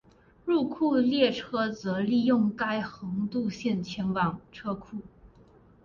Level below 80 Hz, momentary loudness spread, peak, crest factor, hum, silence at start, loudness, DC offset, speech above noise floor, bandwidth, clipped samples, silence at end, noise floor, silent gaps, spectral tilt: -60 dBFS; 12 LU; -12 dBFS; 16 dB; none; 0.45 s; -28 LUFS; under 0.1%; 29 dB; 7.2 kHz; under 0.1%; 0.6 s; -57 dBFS; none; -6.5 dB/octave